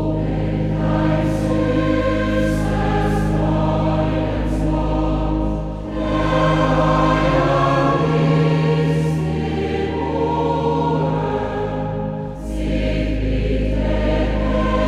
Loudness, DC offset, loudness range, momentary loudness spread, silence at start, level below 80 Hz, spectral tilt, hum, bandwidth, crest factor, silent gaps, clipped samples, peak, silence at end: -19 LUFS; under 0.1%; 4 LU; 7 LU; 0 s; -26 dBFS; -7.5 dB/octave; none; 11 kHz; 14 dB; none; under 0.1%; -4 dBFS; 0 s